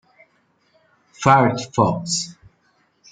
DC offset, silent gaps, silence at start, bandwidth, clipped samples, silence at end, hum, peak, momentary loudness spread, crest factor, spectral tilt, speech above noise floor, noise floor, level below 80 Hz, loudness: under 0.1%; none; 1.2 s; 9.6 kHz; under 0.1%; 0.8 s; none; -2 dBFS; 9 LU; 20 dB; -4.5 dB/octave; 45 dB; -63 dBFS; -58 dBFS; -18 LUFS